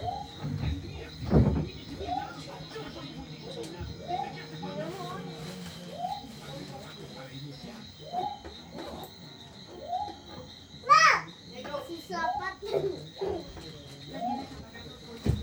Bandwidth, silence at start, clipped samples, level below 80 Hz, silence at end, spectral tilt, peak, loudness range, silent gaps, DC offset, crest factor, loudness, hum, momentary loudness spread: over 20 kHz; 0 s; under 0.1%; -46 dBFS; 0 s; -5 dB/octave; -8 dBFS; 13 LU; none; under 0.1%; 24 dB; -32 LUFS; none; 18 LU